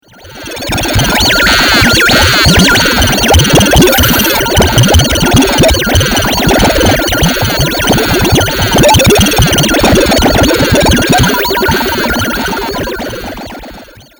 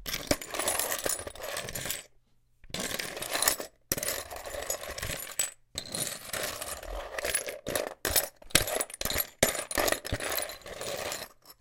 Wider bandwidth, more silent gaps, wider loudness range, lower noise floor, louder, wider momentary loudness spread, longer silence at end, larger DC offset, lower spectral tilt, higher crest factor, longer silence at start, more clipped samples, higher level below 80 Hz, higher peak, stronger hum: first, over 20 kHz vs 17 kHz; neither; about the same, 4 LU vs 5 LU; second, -32 dBFS vs -64 dBFS; first, -7 LUFS vs -31 LUFS; about the same, 10 LU vs 11 LU; first, 0.35 s vs 0.05 s; neither; first, -3.5 dB/octave vs -1.5 dB/octave; second, 8 dB vs 30 dB; first, 0.25 s vs 0 s; first, 0.6% vs under 0.1%; first, -20 dBFS vs -50 dBFS; first, 0 dBFS vs -4 dBFS; neither